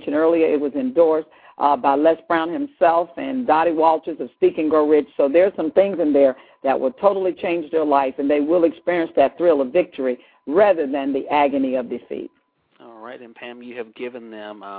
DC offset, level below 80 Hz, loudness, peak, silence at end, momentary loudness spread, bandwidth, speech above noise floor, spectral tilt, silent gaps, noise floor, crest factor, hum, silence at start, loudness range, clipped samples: under 0.1%; -62 dBFS; -19 LUFS; -2 dBFS; 0 s; 16 LU; 4.6 kHz; 33 dB; -10 dB/octave; none; -52 dBFS; 16 dB; none; 0 s; 4 LU; under 0.1%